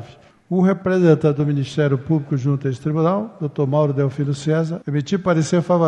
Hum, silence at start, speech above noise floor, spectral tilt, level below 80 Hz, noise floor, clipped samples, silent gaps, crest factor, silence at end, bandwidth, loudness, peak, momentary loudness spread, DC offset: none; 0 s; 25 dB; -7.5 dB/octave; -58 dBFS; -43 dBFS; under 0.1%; none; 16 dB; 0 s; 9.4 kHz; -19 LUFS; -2 dBFS; 7 LU; under 0.1%